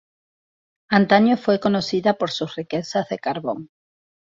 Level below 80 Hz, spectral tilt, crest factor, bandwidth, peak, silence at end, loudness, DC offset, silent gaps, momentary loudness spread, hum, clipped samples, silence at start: -62 dBFS; -6 dB/octave; 20 dB; 7.6 kHz; -2 dBFS; 0.7 s; -21 LUFS; under 0.1%; none; 11 LU; none; under 0.1%; 0.9 s